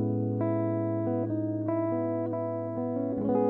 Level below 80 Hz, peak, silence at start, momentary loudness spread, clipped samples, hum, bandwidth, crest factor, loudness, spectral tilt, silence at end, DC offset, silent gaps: -66 dBFS; -16 dBFS; 0 s; 4 LU; under 0.1%; none; 2.8 kHz; 14 dB; -30 LUFS; -13 dB/octave; 0 s; under 0.1%; none